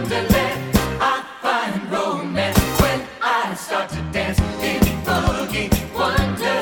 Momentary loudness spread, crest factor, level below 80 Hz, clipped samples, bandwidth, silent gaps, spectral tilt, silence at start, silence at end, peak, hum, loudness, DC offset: 5 LU; 18 dB; -30 dBFS; under 0.1%; 19 kHz; none; -5 dB/octave; 0 s; 0 s; -2 dBFS; none; -20 LUFS; under 0.1%